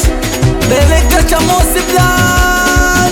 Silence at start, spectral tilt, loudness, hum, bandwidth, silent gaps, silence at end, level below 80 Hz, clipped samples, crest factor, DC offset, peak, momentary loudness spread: 0 s; -4 dB/octave; -10 LUFS; none; 18.5 kHz; none; 0 s; -14 dBFS; under 0.1%; 10 dB; under 0.1%; 0 dBFS; 3 LU